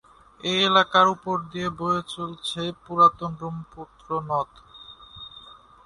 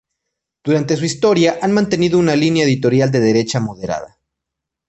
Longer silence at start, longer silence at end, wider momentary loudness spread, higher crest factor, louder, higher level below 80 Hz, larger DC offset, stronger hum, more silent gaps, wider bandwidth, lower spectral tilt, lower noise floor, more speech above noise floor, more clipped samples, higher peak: second, 0.45 s vs 0.65 s; second, 0.35 s vs 0.8 s; first, 24 LU vs 9 LU; first, 22 dB vs 14 dB; second, -23 LUFS vs -15 LUFS; second, -58 dBFS vs -52 dBFS; neither; neither; neither; first, 11.5 kHz vs 8.6 kHz; second, -4.5 dB/octave vs -6 dB/octave; second, -48 dBFS vs -81 dBFS; second, 24 dB vs 67 dB; neither; about the same, -4 dBFS vs -2 dBFS